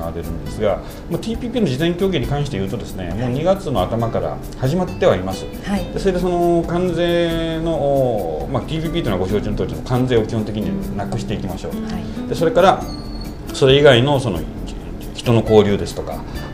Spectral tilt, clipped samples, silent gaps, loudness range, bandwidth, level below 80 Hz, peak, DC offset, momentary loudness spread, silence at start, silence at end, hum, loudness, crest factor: -6.5 dB/octave; under 0.1%; none; 5 LU; 15.5 kHz; -32 dBFS; 0 dBFS; under 0.1%; 13 LU; 0 s; 0 s; none; -19 LUFS; 18 dB